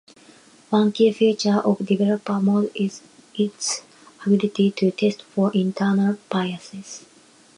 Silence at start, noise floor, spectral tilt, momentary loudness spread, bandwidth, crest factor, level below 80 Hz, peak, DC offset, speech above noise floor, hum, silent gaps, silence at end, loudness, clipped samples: 0.7 s; -50 dBFS; -5.5 dB/octave; 14 LU; 11 kHz; 16 dB; -70 dBFS; -6 dBFS; under 0.1%; 30 dB; none; none; 0.6 s; -21 LUFS; under 0.1%